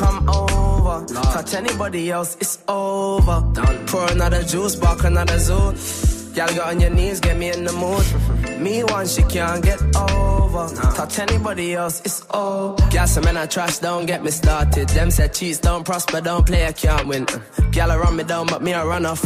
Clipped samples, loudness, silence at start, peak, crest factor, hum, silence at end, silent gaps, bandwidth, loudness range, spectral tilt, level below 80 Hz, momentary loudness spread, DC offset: under 0.1%; -19 LUFS; 0 s; -4 dBFS; 14 dB; none; 0 s; none; 16 kHz; 1 LU; -5 dB/octave; -20 dBFS; 5 LU; under 0.1%